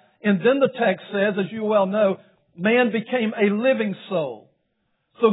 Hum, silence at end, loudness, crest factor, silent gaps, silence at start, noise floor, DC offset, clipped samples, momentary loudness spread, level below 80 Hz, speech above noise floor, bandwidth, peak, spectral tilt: none; 0 s; -21 LUFS; 18 dB; none; 0.25 s; -72 dBFS; under 0.1%; under 0.1%; 8 LU; -78 dBFS; 51 dB; 4 kHz; -4 dBFS; -10 dB/octave